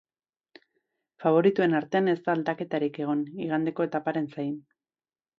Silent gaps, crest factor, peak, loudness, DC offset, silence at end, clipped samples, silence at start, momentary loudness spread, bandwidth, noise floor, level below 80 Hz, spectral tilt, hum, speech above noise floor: none; 20 dB; -8 dBFS; -27 LUFS; under 0.1%; 0.8 s; under 0.1%; 1.2 s; 9 LU; 6.4 kHz; under -90 dBFS; -76 dBFS; -8.5 dB/octave; none; over 64 dB